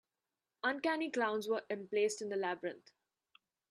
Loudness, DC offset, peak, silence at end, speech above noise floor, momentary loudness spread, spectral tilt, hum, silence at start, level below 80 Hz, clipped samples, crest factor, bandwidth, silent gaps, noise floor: -37 LUFS; under 0.1%; -20 dBFS; 0.9 s; over 53 dB; 6 LU; -3.5 dB/octave; none; 0.65 s; -88 dBFS; under 0.1%; 18 dB; 13 kHz; none; under -90 dBFS